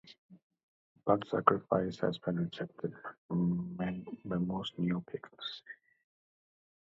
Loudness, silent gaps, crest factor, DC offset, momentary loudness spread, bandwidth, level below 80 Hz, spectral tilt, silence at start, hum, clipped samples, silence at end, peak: -35 LUFS; 0.18-0.29 s, 0.43-0.50 s, 0.63-0.95 s, 3.18-3.29 s; 28 dB; under 0.1%; 14 LU; 7.4 kHz; -66 dBFS; -8 dB/octave; 0.05 s; none; under 0.1%; 1.1 s; -8 dBFS